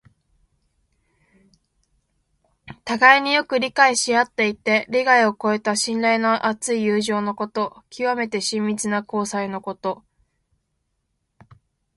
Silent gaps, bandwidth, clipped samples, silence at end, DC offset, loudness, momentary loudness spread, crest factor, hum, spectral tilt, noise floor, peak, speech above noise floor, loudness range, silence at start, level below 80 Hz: none; 11.5 kHz; under 0.1%; 2 s; under 0.1%; -20 LUFS; 12 LU; 22 dB; none; -3 dB/octave; -74 dBFS; 0 dBFS; 53 dB; 9 LU; 2.65 s; -64 dBFS